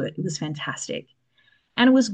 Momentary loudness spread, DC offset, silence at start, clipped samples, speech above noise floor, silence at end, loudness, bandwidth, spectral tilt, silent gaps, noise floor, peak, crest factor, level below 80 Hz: 15 LU; under 0.1%; 0 s; under 0.1%; 41 dB; 0 s; -24 LUFS; 9.2 kHz; -4.5 dB/octave; none; -63 dBFS; -6 dBFS; 18 dB; -70 dBFS